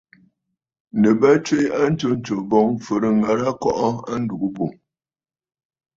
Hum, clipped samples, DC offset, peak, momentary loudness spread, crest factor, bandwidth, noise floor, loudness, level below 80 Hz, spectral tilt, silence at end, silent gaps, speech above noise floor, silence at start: none; under 0.1%; under 0.1%; -2 dBFS; 10 LU; 18 dB; 7.6 kHz; under -90 dBFS; -20 LUFS; -56 dBFS; -6.5 dB/octave; 1.25 s; none; over 71 dB; 0.95 s